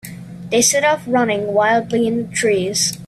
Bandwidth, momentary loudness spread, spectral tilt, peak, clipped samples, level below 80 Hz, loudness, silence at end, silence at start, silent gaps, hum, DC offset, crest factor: 15 kHz; 6 LU; -3 dB/octave; -2 dBFS; under 0.1%; -54 dBFS; -16 LUFS; 0 s; 0.05 s; none; none; under 0.1%; 16 dB